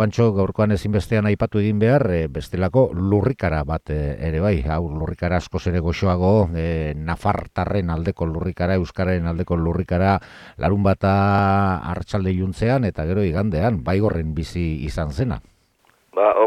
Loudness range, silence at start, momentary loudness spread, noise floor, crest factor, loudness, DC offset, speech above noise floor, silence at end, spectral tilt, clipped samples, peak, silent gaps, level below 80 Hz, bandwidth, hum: 3 LU; 0 s; 8 LU; -60 dBFS; 16 dB; -21 LUFS; under 0.1%; 40 dB; 0 s; -8.5 dB/octave; under 0.1%; -4 dBFS; none; -34 dBFS; 11 kHz; none